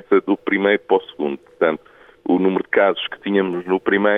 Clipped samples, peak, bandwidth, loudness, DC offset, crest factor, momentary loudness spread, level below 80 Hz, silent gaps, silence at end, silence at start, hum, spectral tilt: under 0.1%; -2 dBFS; 3.9 kHz; -19 LUFS; under 0.1%; 16 dB; 9 LU; -64 dBFS; none; 0 s; 0.1 s; none; -8.5 dB/octave